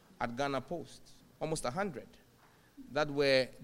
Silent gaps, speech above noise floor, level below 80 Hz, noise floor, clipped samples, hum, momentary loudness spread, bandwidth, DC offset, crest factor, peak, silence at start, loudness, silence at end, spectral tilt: none; 29 dB; -58 dBFS; -64 dBFS; under 0.1%; none; 18 LU; 16 kHz; under 0.1%; 22 dB; -14 dBFS; 0.2 s; -35 LUFS; 0 s; -4.5 dB/octave